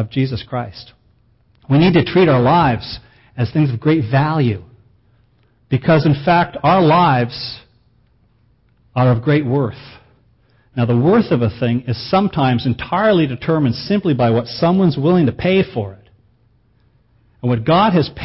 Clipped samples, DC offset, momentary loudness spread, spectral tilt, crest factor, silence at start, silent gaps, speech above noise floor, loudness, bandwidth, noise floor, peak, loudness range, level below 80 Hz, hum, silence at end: under 0.1%; under 0.1%; 13 LU; -11.5 dB/octave; 14 dB; 0 s; none; 41 dB; -16 LUFS; 5.8 kHz; -56 dBFS; -2 dBFS; 3 LU; -44 dBFS; none; 0 s